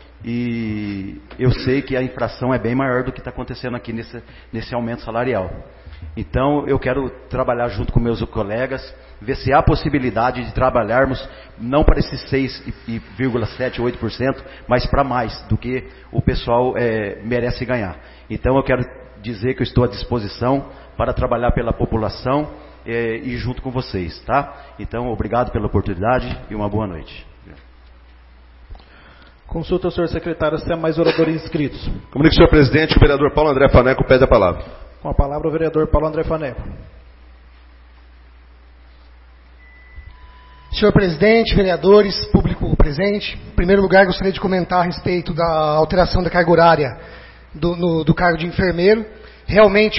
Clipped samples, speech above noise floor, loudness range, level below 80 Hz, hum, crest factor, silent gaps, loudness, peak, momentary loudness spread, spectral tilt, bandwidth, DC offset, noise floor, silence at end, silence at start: under 0.1%; 27 dB; 9 LU; -28 dBFS; none; 18 dB; none; -18 LUFS; 0 dBFS; 16 LU; -10.5 dB/octave; 5.8 kHz; under 0.1%; -44 dBFS; 0 s; 0.2 s